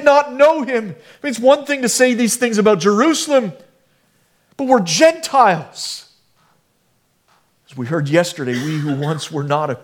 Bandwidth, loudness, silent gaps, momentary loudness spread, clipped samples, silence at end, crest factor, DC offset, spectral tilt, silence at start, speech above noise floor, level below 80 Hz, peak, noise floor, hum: 18 kHz; -16 LUFS; none; 13 LU; under 0.1%; 0.05 s; 16 dB; under 0.1%; -4 dB/octave; 0 s; 46 dB; -66 dBFS; 0 dBFS; -62 dBFS; none